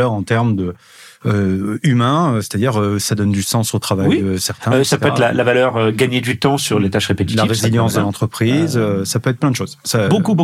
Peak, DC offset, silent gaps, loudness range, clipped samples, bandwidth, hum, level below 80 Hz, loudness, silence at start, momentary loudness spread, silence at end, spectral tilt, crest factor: -2 dBFS; under 0.1%; none; 2 LU; under 0.1%; 15.5 kHz; none; -54 dBFS; -16 LUFS; 0 s; 4 LU; 0 s; -5.5 dB/octave; 14 dB